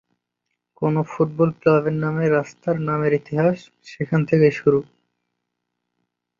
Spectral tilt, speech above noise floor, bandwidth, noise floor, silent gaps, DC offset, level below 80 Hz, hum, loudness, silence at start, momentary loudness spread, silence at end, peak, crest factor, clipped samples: -8.5 dB/octave; 59 dB; 7.2 kHz; -79 dBFS; none; under 0.1%; -60 dBFS; 60 Hz at -45 dBFS; -20 LUFS; 0.8 s; 7 LU; 1.55 s; -4 dBFS; 18 dB; under 0.1%